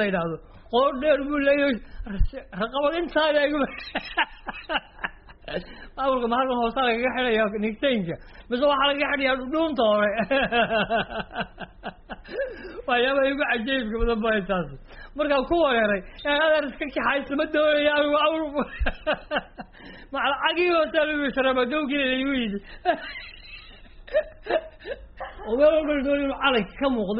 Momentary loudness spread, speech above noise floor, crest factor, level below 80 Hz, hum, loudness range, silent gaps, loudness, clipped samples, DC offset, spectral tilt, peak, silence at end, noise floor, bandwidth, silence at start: 16 LU; 21 dB; 16 dB; -40 dBFS; none; 4 LU; none; -24 LUFS; under 0.1%; under 0.1%; -2.5 dB/octave; -8 dBFS; 0 s; -45 dBFS; 5.4 kHz; 0 s